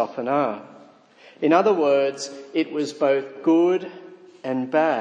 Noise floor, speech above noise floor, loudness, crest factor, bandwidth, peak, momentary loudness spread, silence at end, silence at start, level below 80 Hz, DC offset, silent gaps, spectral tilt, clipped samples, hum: -51 dBFS; 29 dB; -22 LUFS; 18 dB; 9.8 kHz; -4 dBFS; 11 LU; 0 s; 0 s; -80 dBFS; under 0.1%; none; -5.5 dB/octave; under 0.1%; none